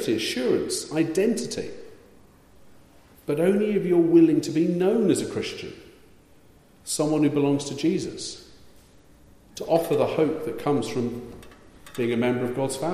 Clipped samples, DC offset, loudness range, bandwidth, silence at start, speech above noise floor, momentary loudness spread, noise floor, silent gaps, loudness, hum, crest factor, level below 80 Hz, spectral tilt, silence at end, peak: under 0.1%; under 0.1%; 5 LU; 15 kHz; 0 s; 31 dB; 17 LU; -54 dBFS; none; -24 LUFS; none; 18 dB; -58 dBFS; -5.5 dB/octave; 0 s; -8 dBFS